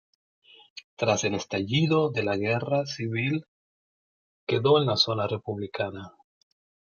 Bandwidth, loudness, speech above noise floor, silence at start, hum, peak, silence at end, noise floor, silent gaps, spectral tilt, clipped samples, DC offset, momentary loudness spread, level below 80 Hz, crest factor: 7.2 kHz; -26 LUFS; over 64 dB; 0.75 s; none; -8 dBFS; 0.8 s; under -90 dBFS; 0.84-0.97 s, 3.48-4.47 s; -5 dB/octave; under 0.1%; under 0.1%; 13 LU; -68 dBFS; 20 dB